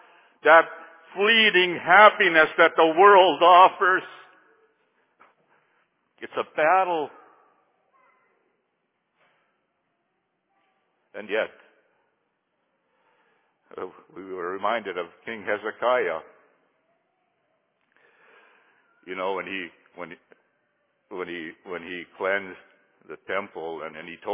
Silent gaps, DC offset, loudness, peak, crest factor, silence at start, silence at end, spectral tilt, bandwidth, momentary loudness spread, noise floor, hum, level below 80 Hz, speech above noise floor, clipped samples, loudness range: none; under 0.1%; -20 LUFS; -2 dBFS; 22 dB; 0.45 s; 0 s; -6.5 dB/octave; 3.8 kHz; 25 LU; -75 dBFS; none; -76 dBFS; 54 dB; under 0.1%; 20 LU